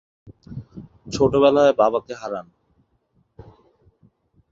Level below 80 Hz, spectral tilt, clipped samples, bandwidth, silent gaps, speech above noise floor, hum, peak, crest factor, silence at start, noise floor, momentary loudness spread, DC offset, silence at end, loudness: -52 dBFS; -6 dB/octave; under 0.1%; 7.8 kHz; none; 47 dB; none; -2 dBFS; 20 dB; 0.25 s; -65 dBFS; 23 LU; under 0.1%; 2.1 s; -19 LUFS